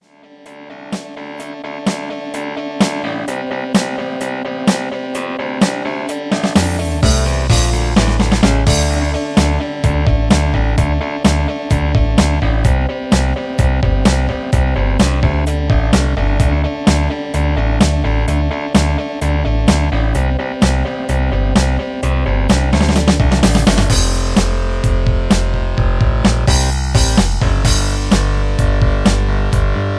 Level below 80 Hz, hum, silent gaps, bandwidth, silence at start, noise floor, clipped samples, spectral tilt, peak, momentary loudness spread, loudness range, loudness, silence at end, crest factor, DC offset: -18 dBFS; none; none; 11 kHz; 0.45 s; -42 dBFS; under 0.1%; -5.5 dB/octave; 0 dBFS; 8 LU; 5 LU; -15 LUFS; 0 s; 14 dB; under 0.1%